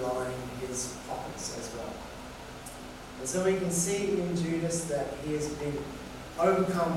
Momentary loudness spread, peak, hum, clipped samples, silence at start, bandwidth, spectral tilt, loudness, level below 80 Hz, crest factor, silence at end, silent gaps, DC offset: 15 LU; -14 dBFS; none; under 0.1%; 0 s; 16 kHz; -4.5 dB/octave; -32 LUFS; -52 dBFS; 18 dB; 0 s; none; under 0.1%